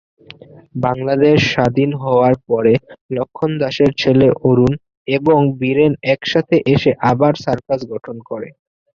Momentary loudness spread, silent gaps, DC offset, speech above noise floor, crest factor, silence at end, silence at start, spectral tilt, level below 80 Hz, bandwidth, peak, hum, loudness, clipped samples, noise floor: 13 LU; 3.01-3.09 s, 4.97-5.05 s; under 0.1%; 26 dB; 14 dB; 0.5 s; 0.75 s; -7 dB/octave; -46 dBFS; 7.2 kHz; -2 dBFS; none; -15 LUFS; under 0.1%; -40 dBFS